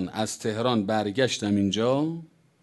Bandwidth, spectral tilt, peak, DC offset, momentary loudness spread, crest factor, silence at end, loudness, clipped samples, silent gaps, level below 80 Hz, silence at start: 12.5 kHz; -5 dB/octave; -8 dBFS; under 0.1%; 6 LU; 18 dB; 0.35 s; -26 LUFS; under 0.1%; none; -56 dBFS; 0 s